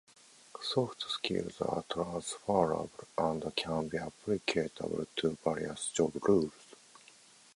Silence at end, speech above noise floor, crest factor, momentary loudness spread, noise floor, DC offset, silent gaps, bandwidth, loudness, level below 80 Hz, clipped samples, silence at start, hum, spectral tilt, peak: 0.8 s; 26 dB; 22 dB; 8 LU; -60 dBFS; under 0.1%; none; 11.5 kHz; -34 LUFS; -64 dBFS; under 0.1%; 0.55 s; none; -4.5 dB/octave; -14 dBFS